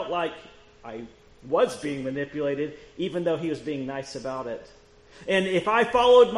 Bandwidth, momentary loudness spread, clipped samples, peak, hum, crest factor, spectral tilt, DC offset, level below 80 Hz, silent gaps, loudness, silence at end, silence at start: 11 kHz; 19 LU; under 0.1%; -6 dBFS; none; 20 dB; -5 dB/octave; under 0.1%; -56 dBFS; none; -26 LUFS; 0 s; 0 s